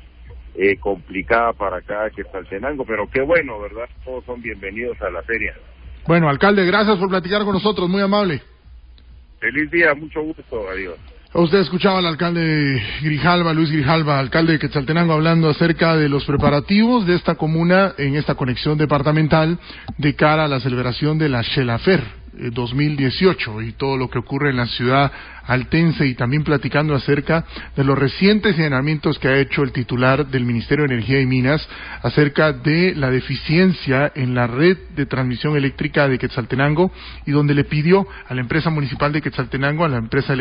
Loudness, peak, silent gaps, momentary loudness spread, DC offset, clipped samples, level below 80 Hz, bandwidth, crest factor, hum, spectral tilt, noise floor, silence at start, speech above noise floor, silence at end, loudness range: -18 LUFS; -2 dBFS; none; 11 LU; under 0.1%; under 0.1%; -40 dBFS; 5.4 kHz; 16 dB; none; -12 dB/octave; -43 dBFS; 0.05 s; 25 dB; 0 s; 5 LU